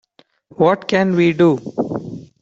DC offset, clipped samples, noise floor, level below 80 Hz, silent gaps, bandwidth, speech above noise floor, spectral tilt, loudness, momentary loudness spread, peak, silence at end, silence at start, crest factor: under 0.1%; under 0.1%; -50 dBFS; -58 dBFS; none; 7.8 kHz; 36 dB; -7.5 dB/octave; -16 LUFS; 12 LU; -2 dBFS; 0.2 s; 0.6 s; 16 dB